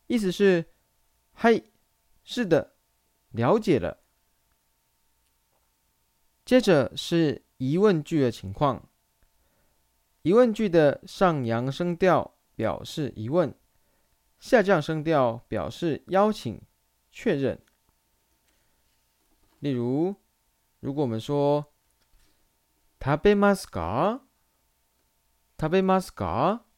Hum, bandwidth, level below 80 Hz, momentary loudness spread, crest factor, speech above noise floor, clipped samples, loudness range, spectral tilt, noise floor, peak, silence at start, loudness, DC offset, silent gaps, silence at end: none; 16.5 kHz; -54 dBFS; 13 LU; 22 dB; 47 dB; under 0.1%; 7 LU; -6.5 dB/octave; -71 dBFS; -6 dBFS; 0.1 s; -25 LUFS; under 0.1%; none; 0.2 s